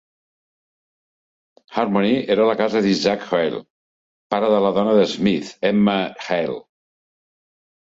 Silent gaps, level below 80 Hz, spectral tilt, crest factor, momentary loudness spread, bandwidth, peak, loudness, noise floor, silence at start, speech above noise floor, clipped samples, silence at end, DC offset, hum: 3.70-4.30 s; -60 dBFS; -6 dB/octave; 18 dB; 8 LU; 7.8 kHz; -4 dBFS; -19 LUFS; under -90 dBFS; 1.7 s; over 72 dB; under 0.1%; 1.35 s; under 0.1%; none